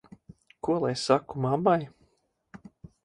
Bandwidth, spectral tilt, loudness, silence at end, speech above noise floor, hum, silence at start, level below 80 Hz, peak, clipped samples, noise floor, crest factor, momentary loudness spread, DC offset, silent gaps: 11 kHz; -6 dB/octave; -27 LUFS; 0.45 s; 45 dB; none; 0.65 s; -62 dBFS; -6 dBFS; under 0.1%; -71 dBFS; 22 dB; 15 LU; under 0.1%; none